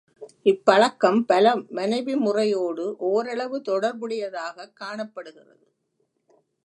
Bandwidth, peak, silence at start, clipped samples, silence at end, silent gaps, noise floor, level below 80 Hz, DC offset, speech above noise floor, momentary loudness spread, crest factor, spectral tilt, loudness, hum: 11 kHz; -2 dBFS; 0.2 s; under 0.1%; 1.35 s; none; -73 dBFS; -78 dBFS; under 0.1%; 50 dB; 16 LU; 22 dB; -5 dB/octave; -23 LUFS; none